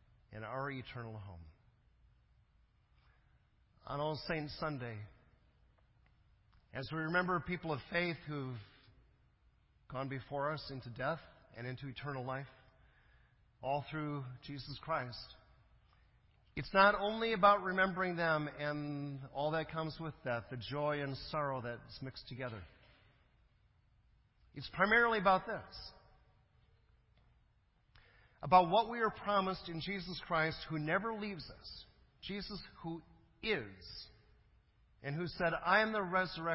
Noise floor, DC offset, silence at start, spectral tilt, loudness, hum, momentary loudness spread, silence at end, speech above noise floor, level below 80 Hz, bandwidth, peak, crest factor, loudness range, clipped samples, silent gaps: -73 dBFS; under 0.1%; 0.3 s; -3.5 dB/octave; -37 LUFS; none; 20 LU; 0 s; 36 dB; -64 dBFS; 5.6 kHz; -14 dBFS; 24 dB; 11 LU; under 0.1%; none